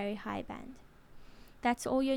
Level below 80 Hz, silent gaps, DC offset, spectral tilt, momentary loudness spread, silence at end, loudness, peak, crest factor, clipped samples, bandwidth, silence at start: -58 dBFS; none; under 0.1%; -4.5 dB/octave; 20 LU; 0 s; -36 LUFS; -18 dBFS; 18 dB; under 0.1%; 16.5 kHz; 0 s